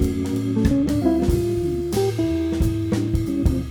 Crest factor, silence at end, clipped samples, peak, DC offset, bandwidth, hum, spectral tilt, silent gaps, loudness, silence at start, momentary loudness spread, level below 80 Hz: 14 dB; 0 s; under 0.1%; -6 dBFS; under 0.1%; 19.5 kHz; none; -7.5 dB/octave; none; -22 LUFS; 0 s; 3 LU; -28 dBFS